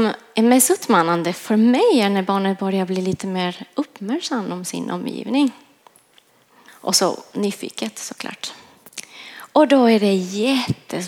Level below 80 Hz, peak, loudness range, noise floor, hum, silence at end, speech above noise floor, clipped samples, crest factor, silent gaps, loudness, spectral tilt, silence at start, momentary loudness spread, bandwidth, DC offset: -66 dBFS; -2 dBFS; 7 LU; -56 dBFS; none; 0 s; 37 dB; under 0.1%; 18 dB; none; -19 LUFS; -4 dB/octave; 0 s; 15 LU; 17.5 kHz; under 0.1%